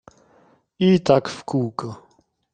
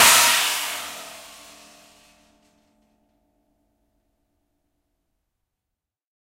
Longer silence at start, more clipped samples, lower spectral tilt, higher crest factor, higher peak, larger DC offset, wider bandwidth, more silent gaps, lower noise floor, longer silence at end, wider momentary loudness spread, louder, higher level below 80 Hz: first, 0.8 s vs 0 s; neither; first, -7 dB/octave vs 1.5 dB/octave; second, 20 dB vs 26 dB; about the same, -2 dBFS vs -2 dBFS; neither; second, 9.2 kHz vs 16 kHz; neither; second, -57 dBFS vs -85 dBFS; second, 0.6 s vs 5 s; second, 17 LU vs 28 LU; second, -21 LUFS vs -17 LUFS; about the same, -58 dBFS vs -62 dBFS